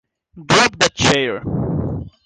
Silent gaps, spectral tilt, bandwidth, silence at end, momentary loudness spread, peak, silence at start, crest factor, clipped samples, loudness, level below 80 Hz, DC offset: none; -3.5 dB/octave; 9.8 kHz; 0.15 s; 9 LU; -2 dBFS; 0.35 s; 16 dB; under 0.1%; -16 LUFS; -38 dBFS; under 0.1%